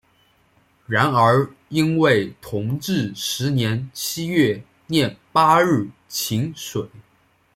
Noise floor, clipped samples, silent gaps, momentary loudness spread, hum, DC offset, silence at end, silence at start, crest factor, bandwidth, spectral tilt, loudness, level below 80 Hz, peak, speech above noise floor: -60 dBFS; under 0.1%; none; 12 LU; none; under 0.1%; 0.55 s; 0.9 s; 18 dB; 16.5 kHz; -5 dB/octave; -20 LUFS; -58 dBFS; -2 dBFS; 41 dB